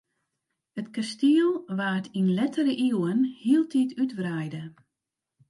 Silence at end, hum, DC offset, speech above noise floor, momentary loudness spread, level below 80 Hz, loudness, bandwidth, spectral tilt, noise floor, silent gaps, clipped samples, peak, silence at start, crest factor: 0.8 s; none; under 0.1%; 61 dB; 13 LU; -76 dBFS; -26 LUFS; 11.5 kHz; -6.5 dB/octave; -87 dBFS; none; under 0.1%; -12 dBFS; 0.75 s; 16 dB